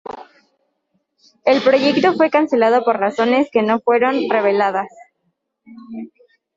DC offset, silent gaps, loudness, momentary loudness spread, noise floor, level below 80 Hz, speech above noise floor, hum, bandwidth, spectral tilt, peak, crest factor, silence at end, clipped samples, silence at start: under 0.1%; none; -16 LUFS; 19 LU; -70 dBFS; -66 dBFS; 55 dB; none; 7.8 kHz; -5.5 dB/octave; -2 dBFS; 16 dB; 0.5 s; under 0.1%; 0.05 s